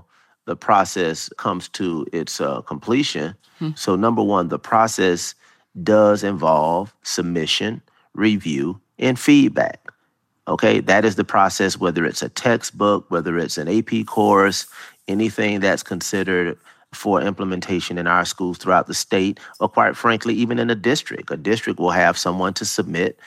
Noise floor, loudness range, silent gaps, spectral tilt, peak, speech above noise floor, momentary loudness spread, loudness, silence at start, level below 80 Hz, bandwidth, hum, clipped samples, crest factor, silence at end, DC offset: -68 dBFS; 4 LU; none; -4.5 dB/octave; 0 dBFS; 49 dB; 10 LU; -19 LUFS; 0.45 s; -60 dBFS; 15.5 kHz; none; under 0.1%; 18 dB; 0.15 s; under 0.1%